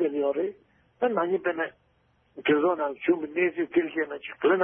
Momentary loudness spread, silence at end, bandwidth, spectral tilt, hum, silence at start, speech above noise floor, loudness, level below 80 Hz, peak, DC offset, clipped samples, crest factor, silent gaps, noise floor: 8 LU; 0 s; 3.6 kHz; -9.5 dB/octave; none; 0 s; 40 dB; -27 LUFS; -72 dBFS; -10 dBFS; under 0.1%; under 0.1%; 16 dB; none; -67 dBFS